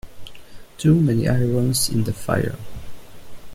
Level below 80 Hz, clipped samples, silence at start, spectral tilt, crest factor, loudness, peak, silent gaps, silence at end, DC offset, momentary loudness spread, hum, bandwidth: -42 dBFS; under 0.1%; 0.05 s; -5.5 dB/octave; 16 dB; -20 LUFS; -6 dBFS; none; 0 s; under 0.1%; 17 LU; none; 16 kHz